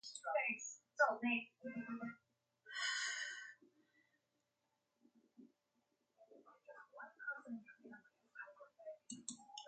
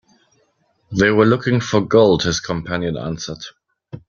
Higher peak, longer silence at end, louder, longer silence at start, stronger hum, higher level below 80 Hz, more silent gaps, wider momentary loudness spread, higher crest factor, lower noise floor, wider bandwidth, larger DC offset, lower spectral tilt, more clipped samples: second, -22 dBFS vs -2 dBFS; about the same, 0 s vs 0.1 s; second, -43 LUFS vs -17 LUFS; second, 0.05 s vs 0.9 s; neither; second, under -90 dBFS vs -48 dBFS; neither; first, 23 LU vs 14 LU; first, 26 dB vs 18 dB; first, -87 dBFS vs -63 dBFS; first, 9.4 kHz vs 7.4 kHz; neither; second, -2 dB/octave vs -5.5 dB/octave; neither